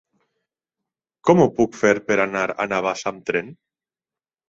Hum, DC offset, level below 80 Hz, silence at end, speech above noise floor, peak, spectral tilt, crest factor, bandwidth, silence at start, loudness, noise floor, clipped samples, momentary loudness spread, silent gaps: none; under 0.1%; -58 dBFS; 0.95 s; over 70 dB; 0 dBFS; -6 dB/octave; 22 dB; 8 kHz; 1.25 s; -20 LUFS; under -90 dBFS; under 0.1%; 10 LU; none